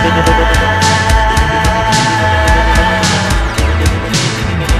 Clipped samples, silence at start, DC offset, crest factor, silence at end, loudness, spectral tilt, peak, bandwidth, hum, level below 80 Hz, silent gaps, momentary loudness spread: under 0.1%; 0 s; under 0.1%; 10 dB; 0 s; -11 LUFS; -4 dB/octave; 0 dBFS; 15 kHz; none; -16 dBFS; none; 4 LU